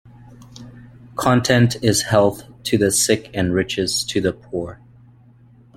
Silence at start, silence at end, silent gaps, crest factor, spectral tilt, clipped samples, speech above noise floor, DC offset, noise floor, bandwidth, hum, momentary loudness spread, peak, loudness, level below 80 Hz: 0.3 s; 1.05 s; none; 18 dB; -4.5 dB/octave; under 0.1%; 31 dB; under 0.1%; -49 dBFS; 16.5 kHz; none; 14 LU; -2 dBFS; -18 LUFS; -48 dBFS